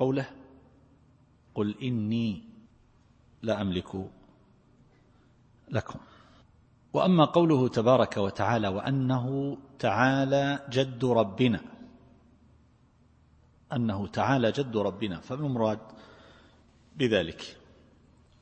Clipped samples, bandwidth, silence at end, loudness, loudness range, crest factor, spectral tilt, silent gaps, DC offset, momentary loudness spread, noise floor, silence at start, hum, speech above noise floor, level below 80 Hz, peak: under 0.1%; 8.6 kHz; 0.9 s; -28 LUFS; 11 LU; 22 dB; -7 dB/octave; none; under 0.1%; 15 LU; -62 dBFS; 0 s; none; 35 dB; -62 dBFS; -8 dBFS